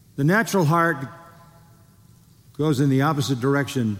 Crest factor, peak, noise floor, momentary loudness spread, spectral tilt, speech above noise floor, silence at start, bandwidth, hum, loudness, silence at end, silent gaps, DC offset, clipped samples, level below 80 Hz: 16 dB; -8 dBFS; -52 dBFS; 6 LU; -6 dB/octave; 32 dB; 0.15 s; 16.5 kHz; none; -21 LUFS; 0 s; none; under 0.1%; under 0.1%; -62 dBFS